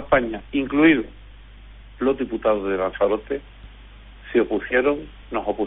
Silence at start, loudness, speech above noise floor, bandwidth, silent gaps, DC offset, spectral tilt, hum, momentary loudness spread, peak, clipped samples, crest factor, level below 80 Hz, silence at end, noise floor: 0 s; -22 LUFS; 22 dB; 4 kHz; none; under 0.1%; -4 dB/octave; none; 12 LU; -4 dBFS; under 0.1%; 20 dB; -42 dBFS; 0 s; -43 dBFS